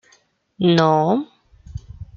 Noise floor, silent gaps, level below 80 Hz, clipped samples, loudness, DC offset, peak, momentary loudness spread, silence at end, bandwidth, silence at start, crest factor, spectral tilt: -58 dBFS; none; -46 dBFS; under 0.1%; -18 LUFS; under 0.1%; -2 dBFS; 22 LU; 0.15 s; 7.2 kHz; 0.6 s; 18 dB; -7 dB/octave